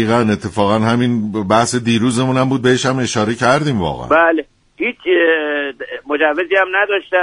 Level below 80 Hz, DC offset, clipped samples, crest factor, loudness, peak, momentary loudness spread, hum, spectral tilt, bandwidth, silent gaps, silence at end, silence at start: -46 dBFS; under 0.1%; under 0.1%; 14 dB; -15 LUFS; 0 dBFS; 7 LU; none; -5 dB/octave; 11 kHz; none; 0 s; 0 s